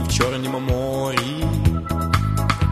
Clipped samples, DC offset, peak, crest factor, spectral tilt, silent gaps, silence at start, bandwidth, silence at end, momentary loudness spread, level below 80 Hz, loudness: under 0.1%; under 0.1%; -2 dBFS; 18 dB; -5.5 dB/octave; none; 0 s; 13.5 kHz; 0 s; 3 LU; -30 dBFS; -21 LUFS